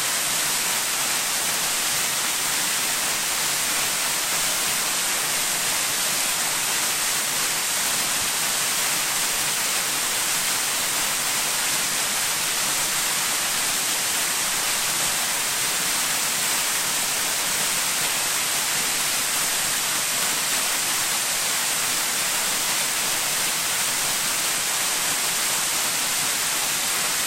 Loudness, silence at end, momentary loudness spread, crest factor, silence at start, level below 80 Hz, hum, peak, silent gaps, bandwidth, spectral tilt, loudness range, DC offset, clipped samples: -21 LUFS; 0 s; 1 LU; 14 dB; 0 s; -56 dBFS; none; -10 dBFS; none; 16 kHz; 1 dB/octave; 0 LU; under 0.1%; under 0.1%